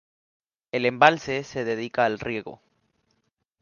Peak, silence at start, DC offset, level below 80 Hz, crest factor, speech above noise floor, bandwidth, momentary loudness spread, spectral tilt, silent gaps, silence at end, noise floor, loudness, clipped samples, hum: 0 dBFS; 0.75 s; under 0.1%; -62 dBFS; 26 dB; 50 dB; 7.2 kHz; 13 LU; -5 dB/octave; none; 1.05 s; -74 dBFS; -24 LUFS; under 0.1%; none